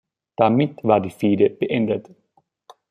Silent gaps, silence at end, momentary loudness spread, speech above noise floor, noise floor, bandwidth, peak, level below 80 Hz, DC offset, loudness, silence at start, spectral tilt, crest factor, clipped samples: none; 0.9 s; 7 LU; 33 dB; -52 dBFS; 13 kHz; -2 dBFS; -64 dBFS; under 0.1%; -20 LUFS; 0.4 s; -8.5 dB/octave; 20 dB; under 0.1%